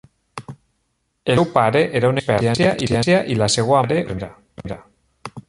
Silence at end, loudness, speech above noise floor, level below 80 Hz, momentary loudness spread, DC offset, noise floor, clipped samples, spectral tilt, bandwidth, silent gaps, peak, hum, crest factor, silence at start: 0.1 s; -18 LUFS; 52 dB; -46 dBFS; 20 LU; under 0.1%; -70 dBFS; under 0.1%; -5 dB/octave; 11.5 kHz; none; 0 dBFS; none; 20 dB; 0.35 s